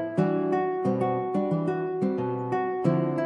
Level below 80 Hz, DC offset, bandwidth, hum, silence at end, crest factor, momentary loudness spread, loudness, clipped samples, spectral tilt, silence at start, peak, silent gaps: -72 dBFS; under 0.1%; 9.2 kHz; none; 0 s; 16 dB; 3 LU; -27 LUFS; under 0.1%; -9.5 dB/octave; 0 s; -10 dBFS; none